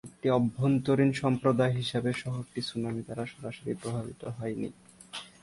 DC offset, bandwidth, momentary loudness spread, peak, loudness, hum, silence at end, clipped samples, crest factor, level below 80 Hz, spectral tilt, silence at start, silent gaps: under 0.1%; 11.5 kHz; 13 LU; -12 dBFS; -30 LUFS; none; 0.15 s; under 0.1%; 18 dB; -62 dBFS; -7 dB/octave; 0.05 s; none